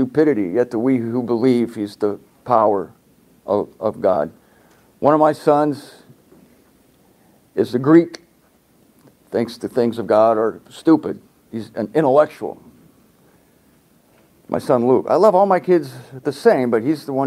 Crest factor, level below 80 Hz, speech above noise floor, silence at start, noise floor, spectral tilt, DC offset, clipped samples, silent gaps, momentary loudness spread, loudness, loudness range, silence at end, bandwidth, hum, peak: 18 dB; -64 dBFS; 39 dB; 0 s; -56 dBFS; -7.5 dB/octave; under 0.1%; under 0.1%; none; 14 LU; -18 LUFS; 4 LU; 0 s; 14 kHz; none; 0 dBFS